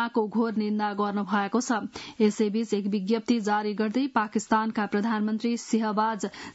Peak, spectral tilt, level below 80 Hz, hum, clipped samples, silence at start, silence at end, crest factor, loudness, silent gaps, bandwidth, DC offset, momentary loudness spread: -10 dBFS; -5.5 dB/octave; -70 dBFS; none; under 0.1%; 0 s; 0.05 s; 16 dB; -27 LUFS; none; 8 kHz; under 0.1%; 3 LU